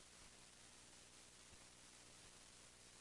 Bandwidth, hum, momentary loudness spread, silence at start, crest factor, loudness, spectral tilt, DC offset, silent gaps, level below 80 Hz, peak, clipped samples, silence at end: 12 kHz; 60 Hz at -75 dBFS; 1 LU; 0 s; 16 dB; -62 LUFS; -1.5 dB/octave; under 0.1%; none; -78 dBFS; -48 dBFS; under 0.1%; 0 s